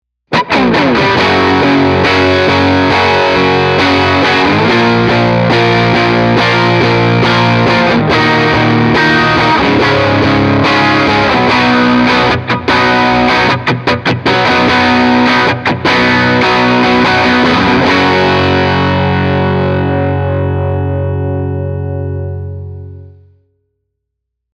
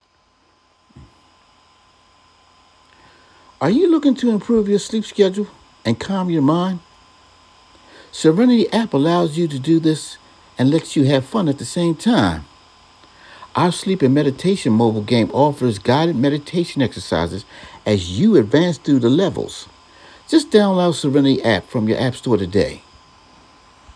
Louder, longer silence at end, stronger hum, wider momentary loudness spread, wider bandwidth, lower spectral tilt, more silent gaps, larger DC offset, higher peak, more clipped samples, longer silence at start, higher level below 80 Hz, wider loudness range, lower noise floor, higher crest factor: first, -9 LUFS vs -17 LUFS; first, 1.45 s vs 1.15 s; neither; second, 6 LU vs 11 LU; about the same, 11 kHz vs 11 kHz; about the same, -6 dB/octave vs -6.5 dB/octave; neither; neither; about the same, 0 dBFS vs 0 dBFS; neither; second, 0.3 s vs 3.6 s; first, -38 dBFS vs -50 dBFS; first, 6 LU vs 3 LU; first, -73 dBFS vs -58 dBFS; second, 10 dB vs 18 dB